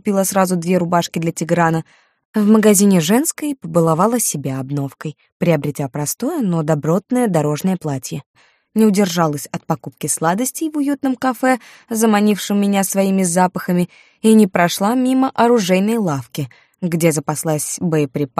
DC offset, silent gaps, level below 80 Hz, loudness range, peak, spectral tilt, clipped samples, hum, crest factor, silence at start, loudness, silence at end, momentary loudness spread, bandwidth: under 0.1%; 2.25-2.33 s, 5.32-5.40 s, 8.26-8.34 s; -60 dBFS; 4 LU; 0 dBFS; -5.5 dB/octave; under 0.1%; none; 16 dB; 0.05 s; -17 LUFS; 0.1 s; 11 LU; 15.5 kHz